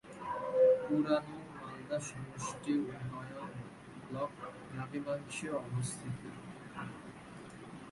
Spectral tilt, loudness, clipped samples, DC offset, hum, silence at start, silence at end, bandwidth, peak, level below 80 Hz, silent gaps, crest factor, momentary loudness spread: -6 dB/octave; -37 LUFS; under 0.1%; under 0.1%; none; 0.05 s; 0 s; 11.5 kHz; -20 dBFS; -68 dBFS; none; 18 dB; 19 LU